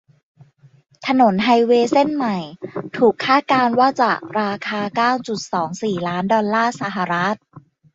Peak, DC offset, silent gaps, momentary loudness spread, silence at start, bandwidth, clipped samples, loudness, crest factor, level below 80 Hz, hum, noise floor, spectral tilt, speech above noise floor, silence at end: -2 dBFS; under 0.1%; none; 9 LU; 1 s; 8 kHz; under 0.1%; -18 LUFS; 16 dB; -62 dBFS; none; -52 dBFS; -5.5 dB/octave; 35 dB; 0.35 s